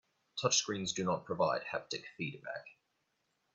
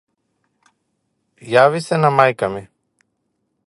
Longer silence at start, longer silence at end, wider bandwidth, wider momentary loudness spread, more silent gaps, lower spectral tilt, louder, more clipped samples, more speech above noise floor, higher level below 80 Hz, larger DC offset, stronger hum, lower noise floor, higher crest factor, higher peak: second, 0.35 s vs 1.45 s; second, 0.8 s vs 1 s; second, 8.4 kHz vs 11.5 kHz; first, 14 LU vs 10 LU; neither; second, -2.5 dB/octave vs -6 dB/octave; second, -35 LUFS vs -16 LUFS; neither; second, 45 dB vs 56 dB; second, -76 dBFS vs -60 dBFS; neither; neither; first, -81 dBFS vs -71 dBFS; about the same, 22 dB vs 20 dB; second, -16 dBFS vs 0 dBFS